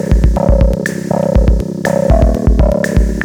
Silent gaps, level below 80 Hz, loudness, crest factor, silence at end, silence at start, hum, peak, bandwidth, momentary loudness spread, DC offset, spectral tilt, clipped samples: none; -14 dBFS; -13 LUFS; 10 dB; 0 s; 0 s; none; 0 dBFS; 12 kHz; 4 LU; under 0.1%; -7.5 dB/octave; under 0.1%